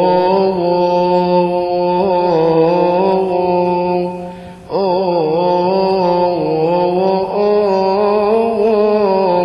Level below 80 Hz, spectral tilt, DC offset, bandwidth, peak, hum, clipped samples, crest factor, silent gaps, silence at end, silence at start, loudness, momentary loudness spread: -48 dBFS; -8.5 dB/octave; under 0.1%; 6.2 kHz; 0 dBFS; none; under 0.1%; 12 dB; none; 0 s; 0 s; -14 LUFS; 4 LU